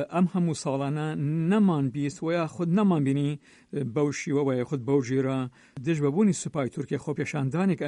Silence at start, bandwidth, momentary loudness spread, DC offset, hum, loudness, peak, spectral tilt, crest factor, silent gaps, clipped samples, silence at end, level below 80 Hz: 0 s; 11 kHz; 8 LU; under 0.1%; none; -27 LUFS; -12 dBFS; -7 dB/octave; 14 dB; none; under 0.1%; 0 s; -66 dBFS